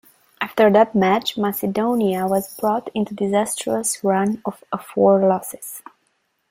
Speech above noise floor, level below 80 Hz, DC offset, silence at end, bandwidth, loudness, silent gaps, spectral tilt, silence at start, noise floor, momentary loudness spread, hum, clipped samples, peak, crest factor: 49 dB; -62 dBFS; under 0.1%; 0.7 s; 16 kHz; -19 LUFS; none; -5 dB/octave; 0.4 s; -68 dBFS; 13 LU; none; under 0.1%; -2 dBFS; 18 dB